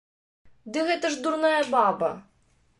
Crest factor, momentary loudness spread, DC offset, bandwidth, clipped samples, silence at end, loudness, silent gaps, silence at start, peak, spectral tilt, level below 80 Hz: 18 dB; 9 LU; under 0.1%; 11.5 kHz; under 0.1%; 0.6 s; -25 LUFS; none; 0.65 s; -10 dBFS; -3.5 dB/octave; -68 dBFS